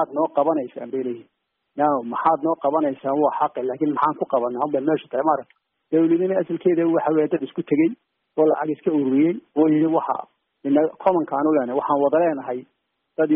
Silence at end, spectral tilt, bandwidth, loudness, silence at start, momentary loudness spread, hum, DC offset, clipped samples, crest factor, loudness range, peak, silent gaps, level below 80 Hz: 0 s; -7 dB/octave; 3.7 kHz; -21 LUFS; 0 s; 9 LU; none; under 0.1%; under 0.1%; 16 dB; 2 LU; -6 dBFS; none; -68 dBFS